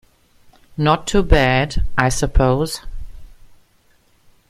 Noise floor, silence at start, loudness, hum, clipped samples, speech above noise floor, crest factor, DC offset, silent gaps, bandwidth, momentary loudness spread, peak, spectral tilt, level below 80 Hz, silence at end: -56 dBFS; 0.75 s; -18 LUFS; none; under 0.1%; 41 dB; 18 dB; under 0.1%; none; 16 kHz; 18 LU; 0 dBFS; -5 dB/octave; -24 dBFS; 1.15 s